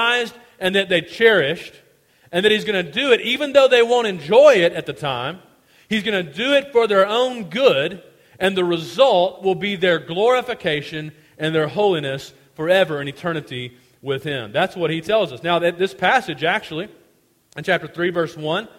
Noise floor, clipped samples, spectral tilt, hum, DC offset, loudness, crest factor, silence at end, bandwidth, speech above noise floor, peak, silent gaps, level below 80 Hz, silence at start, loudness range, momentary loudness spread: -58 dBFS; under 0.1%; -5 dB/octave; none; under 0.1%; -18 LUFS; 18 dB; 0.1 s; 16 kHz; 40 dB; 0 dBFS; none; -60 dBFS; 0 s; 6 LU; 15 LU